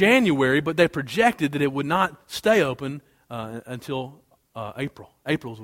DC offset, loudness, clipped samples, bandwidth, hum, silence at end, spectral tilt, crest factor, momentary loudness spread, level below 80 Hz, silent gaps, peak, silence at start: under 0.1%; -23 LUFS; under 0.1%; 16.5 kHz; none; 0 s; -5.5 dB/octave; 20 dB; 16 LU; -58 dBFS; none; -4 dBFS; 0 s